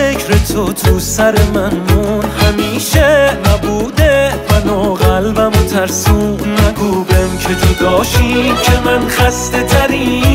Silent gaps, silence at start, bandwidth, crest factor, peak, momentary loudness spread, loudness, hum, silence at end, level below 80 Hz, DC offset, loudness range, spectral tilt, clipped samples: none; 0 s; 16.5 kHz; 10 dB; 0 dBFS; 4 LU; -12 LUFS; none; 0 s; -20 dBFS; under 0.1%; 1 LU; -5 dB/octave; under 0.1%